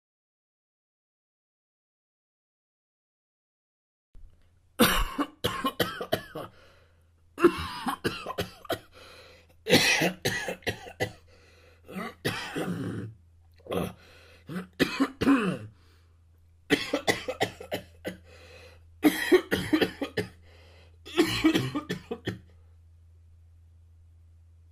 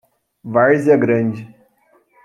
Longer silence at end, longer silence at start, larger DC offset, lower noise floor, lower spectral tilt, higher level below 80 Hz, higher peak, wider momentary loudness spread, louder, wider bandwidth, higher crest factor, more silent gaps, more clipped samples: first, 2.3 s vs 0.8 s; first, 4.2 s vs 0.45 s; neither; first, -61 dBFS vs -57 dBFS; second, -4 dB/octave vs -9 dB/octave; first, -50 dBFS vs -62 dBFS; second, -8 dBFS vs -2 dBFS; about the same, 19 LU vs 17 LU; second, -28 LUFS vs -15 LUFS; first, 15.5 kHz vs 10.5 kHz; first, 24 dB vs 16 dB; neither; neither